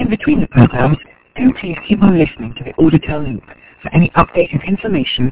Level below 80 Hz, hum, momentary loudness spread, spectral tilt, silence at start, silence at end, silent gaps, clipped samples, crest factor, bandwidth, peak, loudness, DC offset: -34 dBFS; none; 14 LU; -11.5 dB/octave; 0 s; 0 s; none; under 0.1%; 14 dB; 4 kHz; 0 dBFS; -14 LUFS; under 0.1%